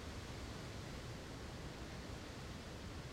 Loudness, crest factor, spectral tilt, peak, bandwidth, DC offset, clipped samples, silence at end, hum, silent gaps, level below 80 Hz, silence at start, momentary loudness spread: -50 LUFS; 12 dB; -5 dB/octave; -36 dBFS; 16 kHz; under 0.1%; under 0.1%; 0 s; none; none; -56 dBFS; 0 s; 1 LU